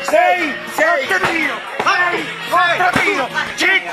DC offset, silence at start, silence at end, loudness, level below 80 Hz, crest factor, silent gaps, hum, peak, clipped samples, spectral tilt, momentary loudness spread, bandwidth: under 0.1%; 0 s; 0 s; -15 LUFS; -52 dBFS; 14 dB; none; none; -2 dBFS; under 0.1%; -3 dB/octave; 6 LU; 14 kHz